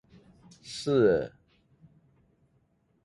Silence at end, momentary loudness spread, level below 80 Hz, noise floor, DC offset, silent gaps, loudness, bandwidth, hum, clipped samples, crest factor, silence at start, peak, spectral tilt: 1.75 s; 19 LU; -62 dBFS; -70 dBFS; under 0.1%; none; -27 LUFS; 11.5 kHz; none; under 0.1%; 20 dB; 0.65 s; -12 dBFS; -6 dB/octave